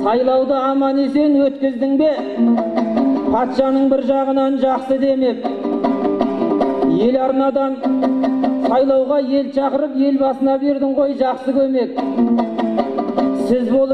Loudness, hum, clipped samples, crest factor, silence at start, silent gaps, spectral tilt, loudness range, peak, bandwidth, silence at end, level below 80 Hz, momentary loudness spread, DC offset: -17 LUFS; none; under 0.1%; 14 dB; 0 s; none; -7.5 dB/octave; 1 LU; -2 dBFS; 6 kHz; 0 s; -52 dBFS; 4 LU; under 0.1%